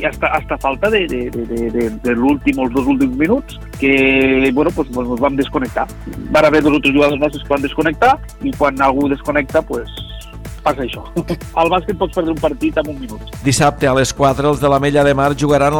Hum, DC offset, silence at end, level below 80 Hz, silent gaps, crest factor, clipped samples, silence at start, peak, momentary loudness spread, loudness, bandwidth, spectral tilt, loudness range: none; under 0.1%; 0 s; -32 dBFS; none; 16 dB; under 0.1%; 0 s; 0 dBFS; 10 LU; -15 LUFS; 18.5 kHz; -5.5 dB/octave; 5 LU